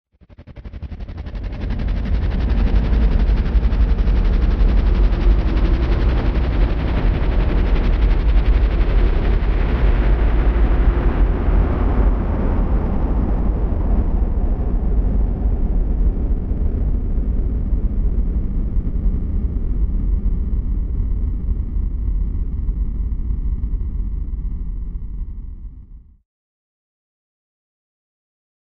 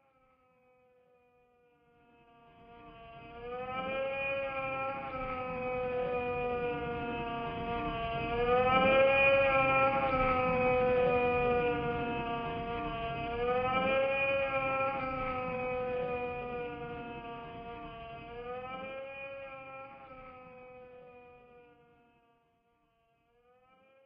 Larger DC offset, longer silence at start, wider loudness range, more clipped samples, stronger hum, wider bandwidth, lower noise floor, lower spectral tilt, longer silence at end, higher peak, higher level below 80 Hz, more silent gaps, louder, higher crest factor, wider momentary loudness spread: neither; second, 0.4 s vs 2.6 s; second, 8 LU vs 18 LU; neither; neither; about the same, 5 kHz vs 5.2 kHz; second, -42 dBFS vs -73 dBFS; first, -9.5 dB/octave vs -3.5 dB/octave; first, 2.8 s vs 2.45 s; first, -4 dBFS vs -14 dBFS; first, -18 dBFS vs -54 dBFS; neither; first, -21 LUFS vs -32 LUFS; second, 14 dB vs 20 dB; second, 9 LU vs 20 LU